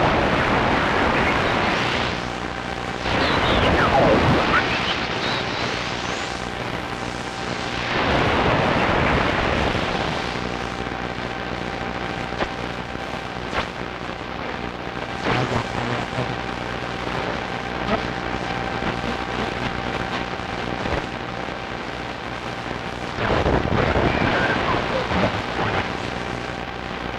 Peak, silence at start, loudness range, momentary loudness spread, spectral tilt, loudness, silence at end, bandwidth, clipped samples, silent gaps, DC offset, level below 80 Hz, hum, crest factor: -6 dBFS; 0 s; 8 LU; 10 LU; -5 dB/octave; -23 LUFS; 0 s; 13.5 kHz; under 0.1%; none; under 0.1%; -36 dBFS; 60 Hz at -45 dBFS; 16 dB